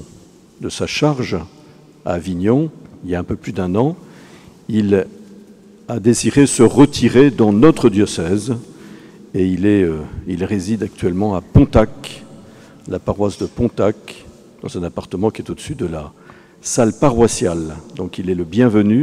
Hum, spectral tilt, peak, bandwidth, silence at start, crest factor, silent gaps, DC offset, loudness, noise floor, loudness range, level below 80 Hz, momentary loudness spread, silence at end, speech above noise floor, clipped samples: none; -6 dB/octave; -2 dBFS; 14 kHz; 0 s; 16 dB; none; under 0.1%; -16 LUFS; -44 dBFS; 9 LU; -38 dBFS; 17 LU; 0 s; 29 dB; under 0.1%